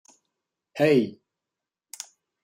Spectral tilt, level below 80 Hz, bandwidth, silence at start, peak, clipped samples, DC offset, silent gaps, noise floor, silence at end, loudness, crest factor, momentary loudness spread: -5.5 dB/octave; -74 dBFS; 16 kHz; 0.75 s; -8 dBFS; under 0.1%; under 0.1%; none; -88 dBFS; 1.35 s; -23 LUFS; 20 dB; 21 LU